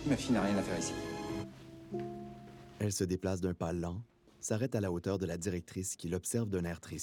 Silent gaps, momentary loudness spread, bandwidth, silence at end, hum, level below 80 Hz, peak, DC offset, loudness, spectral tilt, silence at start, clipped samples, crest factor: none; 13 LU; 18.5 kHz; 0 s; none; -60 dBFS; -20 dBFS; under 0.1%; -36 LUFS; -5.5 dB/octave; 0 s; under 0.1%; 16 dB